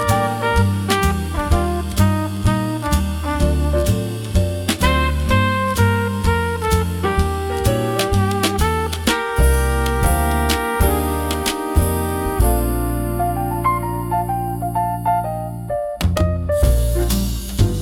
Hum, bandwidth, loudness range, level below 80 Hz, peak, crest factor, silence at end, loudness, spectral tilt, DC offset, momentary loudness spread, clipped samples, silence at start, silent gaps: none; 18 kHz; 2 LU; -24 dBFS; -2 dBFS; 16 dB; 0 s; -19 LUFS; -5.5 dB/octave; under 0.1%; 4 LU; under 0.1%; 0 s; none